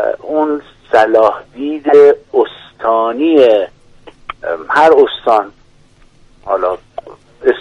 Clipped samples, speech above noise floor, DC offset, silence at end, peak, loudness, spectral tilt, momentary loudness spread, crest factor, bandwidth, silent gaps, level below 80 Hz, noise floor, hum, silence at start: under 0.1%; 34 dB; under 0.1%; 0 s; 0 dBFS; -12 LUFS; -5.5 dB/octave; 17 LU; 12 dB; 8.4 kHz; none; -50 dBFS; -46 dBFS; none; 0 s